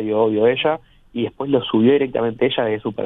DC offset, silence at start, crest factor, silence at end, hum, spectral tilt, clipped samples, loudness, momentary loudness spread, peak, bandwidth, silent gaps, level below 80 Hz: under 0.1%; 0 s; 16 dB; 0 s; none; -9 dB/octave; under 0.1%; -19 LUFS; 10 LU; -4 dBFS; 4 kHz; none; -54 dBFS